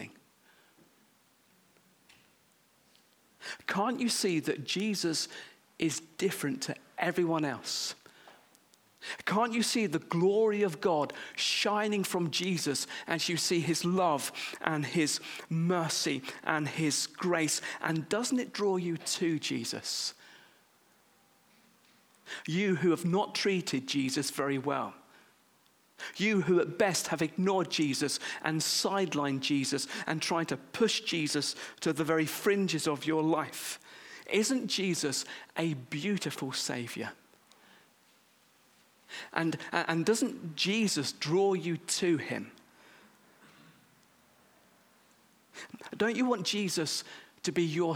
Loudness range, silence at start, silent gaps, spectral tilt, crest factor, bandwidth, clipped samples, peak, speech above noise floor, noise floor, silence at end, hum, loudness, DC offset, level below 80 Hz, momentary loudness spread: 7 LU; 0 s; none; -4 dB/octave; 26 dB; 19.5 kHz; under 0.1%; -8 dBFS; 36 dB; -67 dBFS; 0 s; none; -31 LUFS; under 0.1%; -78 dBFS; 9 LU